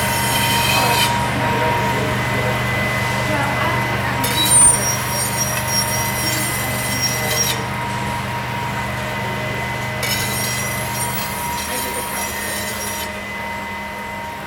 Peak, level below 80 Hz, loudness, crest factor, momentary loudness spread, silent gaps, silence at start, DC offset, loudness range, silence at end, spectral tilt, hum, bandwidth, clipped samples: -2 dBFS; -38 dBFS; -18 LUFS; 18 dB; 8 LU; none; 0 s; under 0.1%; 6 LU; 0 s; -2.5 dB/octave; none; over 20 kHz; under 0.1%